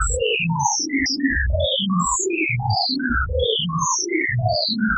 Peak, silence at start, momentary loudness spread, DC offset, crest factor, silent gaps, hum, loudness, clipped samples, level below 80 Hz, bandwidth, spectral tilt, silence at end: -6 dBFS; 0 s; 1 LU; under 0.1%; 14 dB; none; none; -20 LUFS; under 0.1%; -32 dBFS; 8.6 kHz; -3.5 dB/octave; 0 s